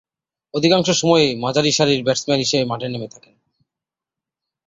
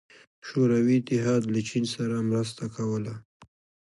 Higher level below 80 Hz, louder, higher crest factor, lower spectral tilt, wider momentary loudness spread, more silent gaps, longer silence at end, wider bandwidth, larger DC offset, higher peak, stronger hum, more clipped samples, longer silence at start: first, -58 dBFS vs -64 dBFS; first, -17 LUFS vs -27 LUFS; about the same, 18 dB vs 14 dB; second, -4 dB/octave vs -6.5 dB/octave; about the same, 12 LU vs 10 LU; second, none vs 3.25-3.40 s; first, 1.6 s vs 0.5 s; second, 8 kHz vs 11.5 kHz; neither; first, -2 dBFS vs -12 dBFS; neither; neither; about the same, 0.55 s vs 0.45 s